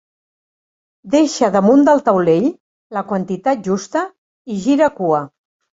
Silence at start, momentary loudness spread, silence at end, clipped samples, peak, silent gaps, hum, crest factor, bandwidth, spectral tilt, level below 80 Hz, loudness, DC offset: 1.05 s; 14 LU; 0.5 s; under 0.1%; -2 dBFS; 2.60-2.90 s, 4.18-4.45 s; none; 16 dB; 8 kHz; -6 dB/octave; -60 dBFS; -16 LUFS; under 0.1%